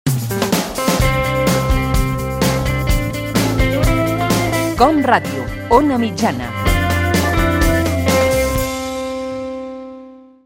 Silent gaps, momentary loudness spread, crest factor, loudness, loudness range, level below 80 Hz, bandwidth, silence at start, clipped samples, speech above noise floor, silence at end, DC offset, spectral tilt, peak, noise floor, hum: none; 10 LU; 16 dB; -16 LUFS; 2 LU; -24 dBFS; 17 kHz; 0.05 s; under 0.1%; 24 dB; 0.25 s; under 0.1%; -5 dB/octave; 0 dBFS; -38 dBFS; none